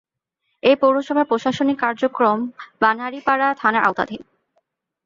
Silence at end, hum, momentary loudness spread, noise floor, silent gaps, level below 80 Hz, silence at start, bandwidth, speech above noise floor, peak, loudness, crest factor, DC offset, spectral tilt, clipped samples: 0.85 s; none; 8 LU; -74 dBFS; none; -64 dBFS; 0.65 s; 7.6 kHz; 56 dB; -2 dBFS; -19 LUFS; 18 dB; under 0.1%; -5.5 dB/octave; under 0.1%